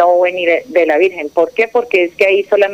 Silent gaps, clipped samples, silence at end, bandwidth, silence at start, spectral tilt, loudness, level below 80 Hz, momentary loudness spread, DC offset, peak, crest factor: none; under 0.1%; 0 s; 15 kHz; 0 s; -4 dB/octave; -13 LUFS; -60 dBFS; 4 LU; under 0.1%; 0 dBFS; 12 dB